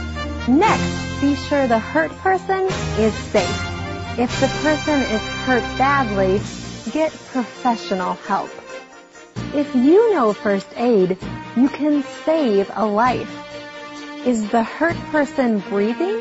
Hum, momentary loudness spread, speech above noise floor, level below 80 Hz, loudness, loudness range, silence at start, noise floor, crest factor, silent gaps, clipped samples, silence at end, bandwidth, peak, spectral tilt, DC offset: none; 10 LU; 24 dB; -40 dBFS; -19 LUFS; 3 LU; 0 s; -43 dBFS; 16 dB; none; under 0.1%; 0 s; 8 kHz; -4 dBFS; -5.5 dB/octave; under 0.1%